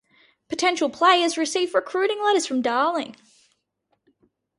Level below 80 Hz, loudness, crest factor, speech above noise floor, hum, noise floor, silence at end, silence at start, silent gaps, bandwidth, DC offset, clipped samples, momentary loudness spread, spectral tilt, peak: -72 dBFS; -22 LUFS; 20 dB; 51 dB; none; -73 dBFS; 1.45 s; 0.5 s; none; 11.5 kHz; under 0.1%; under 0.1%; 8 LU; -1.5 dB/octave; -4 dBFS